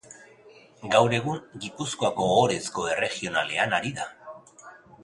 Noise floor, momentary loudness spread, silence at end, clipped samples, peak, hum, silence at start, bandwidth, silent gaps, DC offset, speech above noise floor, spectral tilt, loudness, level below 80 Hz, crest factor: -53 dBFS; 17 LU; 0 s; under 0.1%; -6 dBFS; none; 0.1 s; 11.5 kHz; none; under 0.1%; 27 dB; -4 dB/octave; -25 LUFS; -62 dBFS; 22 dB